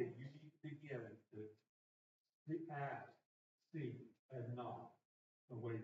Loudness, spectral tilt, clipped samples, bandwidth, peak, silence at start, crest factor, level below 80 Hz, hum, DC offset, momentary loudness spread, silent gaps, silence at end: -52 LUFS; -7.5 dB/octave; under 0.1%; 7.4 kHz; -30 dBFS; 0 s; 22 dB; under -90 dBFS; none; under 0.1%; 11 LU; 1.69-2.25 s, 2.33-2.45 s, 3.26-3.58 s, 4.19-4.29 s, 5.05-5.48 s; 0 s